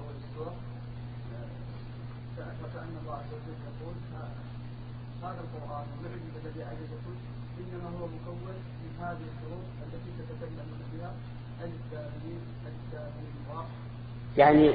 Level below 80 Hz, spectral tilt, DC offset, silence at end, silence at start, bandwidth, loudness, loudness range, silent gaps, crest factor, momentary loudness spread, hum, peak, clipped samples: -50 dBFS; -6.5 dB/octave; under 0.1%; 0 s; 0 s; 4.8 kHz; -36 LUFS; 1 LU; none; 26 dB; 4 LU; none; -8 dBFS; under 0.1%